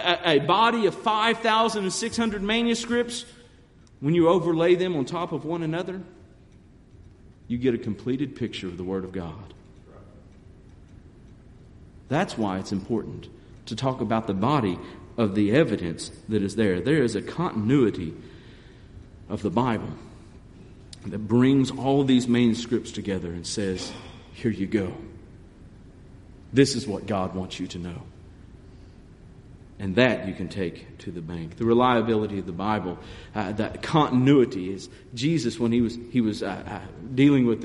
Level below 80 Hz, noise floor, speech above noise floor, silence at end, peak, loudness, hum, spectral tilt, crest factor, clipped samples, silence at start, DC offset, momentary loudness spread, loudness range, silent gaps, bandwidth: -52 dBFS; -53 dBFS; 28 dB; 0 s; -4 dBFS; -25 LUFS; none; -6 dB/octave; 22 dB; under 0.1%; 0 s; under 0.1%; 16 LU; 8 LU; none; 11.5 kHz